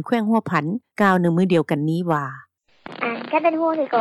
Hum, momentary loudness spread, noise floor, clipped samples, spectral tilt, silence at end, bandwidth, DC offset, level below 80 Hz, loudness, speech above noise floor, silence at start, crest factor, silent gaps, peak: none; 10 LU; -41 dBFS; under 0.1%; -8 dB/octave; 0 s; 12.5 kHz; under 0.1%; -70 dBFS; -20 LUFS; 22 dB; 0 s; 16 dB; none; -4 dBFS